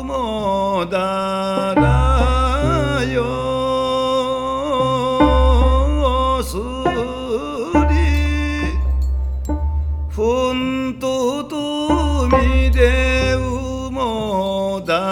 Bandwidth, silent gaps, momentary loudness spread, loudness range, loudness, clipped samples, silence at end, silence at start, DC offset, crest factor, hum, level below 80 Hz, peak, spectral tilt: 12 kHz; none; 8 LU; 3 LU; -18 LUFS; under 0.1%; 0 s; 0 s; under 0.1%; 16 dB; none; -22 dBFS; 0 dBFS; -6.5 dB/octave